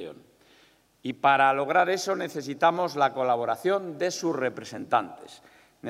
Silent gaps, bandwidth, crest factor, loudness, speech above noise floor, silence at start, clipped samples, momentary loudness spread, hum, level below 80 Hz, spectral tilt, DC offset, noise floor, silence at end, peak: none; 15.5 kHz; 20 dB; -25 LUFS; 35 dB; 0 s; under 0.1%; 16 LU; none; -78 dBFS; -4 dB/octave; under 0.1%; -61 dBFS; 0 s; -8 dBFS